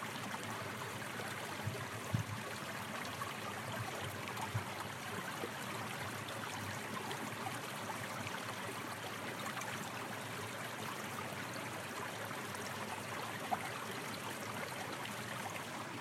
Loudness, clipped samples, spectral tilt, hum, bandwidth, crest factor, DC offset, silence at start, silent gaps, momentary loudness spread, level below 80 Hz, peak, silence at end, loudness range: -42 LUFS; under 0.1%; -3.5 dB/octave; none; 16 kHz; 22 dB; under 0.1%; 0 s; none; 2 LU; -78 dBFS; -22 dBFS; 0 s; 1 LU